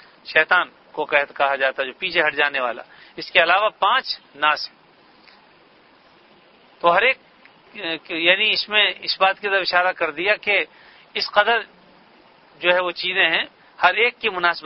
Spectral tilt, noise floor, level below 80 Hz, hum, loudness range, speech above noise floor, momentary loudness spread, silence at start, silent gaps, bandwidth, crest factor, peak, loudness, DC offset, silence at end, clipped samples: -4.5 dB/octave; -53 dBFS; -64 dBFS; none; 6 LU; 33 dB; 12 LU; 0.25 s; none; 6 kHz; 22 dB; 0 dBFS; -19 LUFS; under 0.1%; 0.05 s; under 0.1%